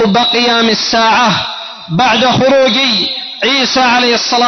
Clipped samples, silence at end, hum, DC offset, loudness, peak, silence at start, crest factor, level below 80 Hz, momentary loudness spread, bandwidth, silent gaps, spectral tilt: under 0.1%; 0 s; none; under 0.1%; -10 LUFS; -2 dBFS; 0 s; 8 dB; -48 dBFS; 7 LU; 6.4 kHz; none; -3.5 dB/octave